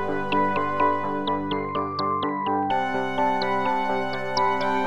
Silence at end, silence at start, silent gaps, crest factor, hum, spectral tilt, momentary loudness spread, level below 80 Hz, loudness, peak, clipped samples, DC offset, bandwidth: 0 s; 0 s; none; 14 dB; none; -5.5 dB/octave; 4 LU; -62 dBFS; -24 LUFS; -10 dBFS; under 0.1%; 2%; 11.5 kHz